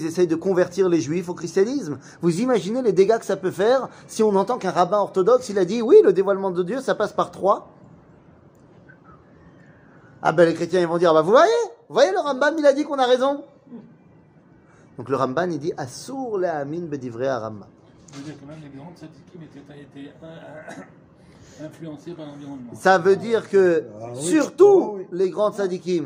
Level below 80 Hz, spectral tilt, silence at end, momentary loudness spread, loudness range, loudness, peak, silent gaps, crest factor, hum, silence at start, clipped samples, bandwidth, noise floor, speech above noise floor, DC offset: -66 dBFS; -5.5 dB/octave; 0 s; 23 LU; 20 LU; -20 LUFS; -2 dBFS; none; 20 dB; none; 0 s; under 0.1%; 16 kHz; -52 dBFS; 32 dB; under 0.1%